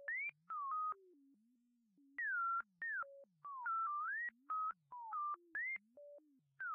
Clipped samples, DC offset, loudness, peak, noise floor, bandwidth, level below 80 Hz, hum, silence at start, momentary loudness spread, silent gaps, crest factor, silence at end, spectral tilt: under 0.1%; under 0.1%; -43 LUFS; -36 dBFS; -78 dBFS; 3.4 kHz; under -90 dBFS; none; 0 s; 13 LU; none; 10 dB; 0 s; 8 dB/octave